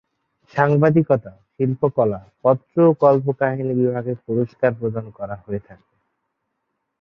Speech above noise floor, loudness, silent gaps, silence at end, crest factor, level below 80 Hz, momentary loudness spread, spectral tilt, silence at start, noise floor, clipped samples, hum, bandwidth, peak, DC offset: 57 dB; -19 LUFS; none; 1.3 s; 18 dB; -58 dBFS; 14 LU; -11 dB/octave; 0.55 s; -76 dBFS; under 0.1%; none; 6.4 kHz; -2 dBFS; under 0.1%